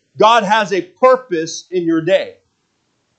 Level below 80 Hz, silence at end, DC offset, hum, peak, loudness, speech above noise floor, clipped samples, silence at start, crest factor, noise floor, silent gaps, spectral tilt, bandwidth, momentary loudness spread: -70 dBFS; 0.9 s; under 0.1%; none; 0 dBFS; -15 LUFS; 51 dB; under 0.1%; 0.15 s; 16 dB; -65 dBFS; none; -4 dB/octave; 8.8 kHz; 10 LU